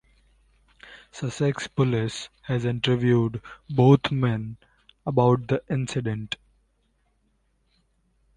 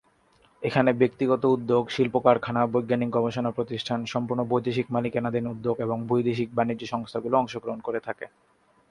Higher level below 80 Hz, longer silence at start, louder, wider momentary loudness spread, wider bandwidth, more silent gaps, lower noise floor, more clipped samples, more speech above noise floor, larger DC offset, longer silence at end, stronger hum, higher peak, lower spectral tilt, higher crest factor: first, -54 dBFS vs -62 dBFS; first, 0.85 s vs 0.6 s; about the same, -24 LUFS vs -26 LUFS; first, 16 LU vs 9 LU; about the same, 10 kHz vs 11 kHz; neither; first, -68 dBFS vs -62 dBFS; neither; first, 45 dB vs 37 dB; neither; first, 2 s vs 0.65 s; neither; about the same, -4 dBFS vs -4 dBFS; about the same, -7 dB/octave vs -7 dB/octave; about the same, 22 dB vs 22 dB